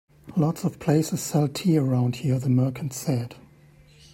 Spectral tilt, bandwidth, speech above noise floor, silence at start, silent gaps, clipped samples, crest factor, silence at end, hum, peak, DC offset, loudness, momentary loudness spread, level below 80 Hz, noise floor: -6.5 dB/octave; 16.5 kHz; 30 dB; 0.25 s; none; under 0.1%; 14 dB; 0.75 s; none; -10 dBFS; under 0.1%; -25 LUFS; 7 LU; -60 dBFS; -53 dBFS